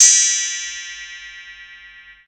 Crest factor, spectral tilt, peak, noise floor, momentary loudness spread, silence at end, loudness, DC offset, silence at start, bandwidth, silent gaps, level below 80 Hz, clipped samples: 20 dB; 6 dB/octave; 0 dBFS; -43 dBFS; 25 LU; 0.4 s; -15 LUFS; under 0.1%; 0 s; 16 kHz; none; -60 dBFS; under 0.1%